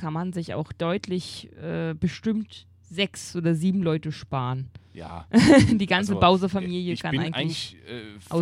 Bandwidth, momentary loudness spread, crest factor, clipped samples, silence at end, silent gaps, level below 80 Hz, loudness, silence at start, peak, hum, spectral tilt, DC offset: 13.5 kHz; 18 LU; 22 dB; under 0.1%; 0 s; none; -48 dBFS; -24 LUFS; 0 s; -2 dBFS; none; -6 dB/octave; under 0.1%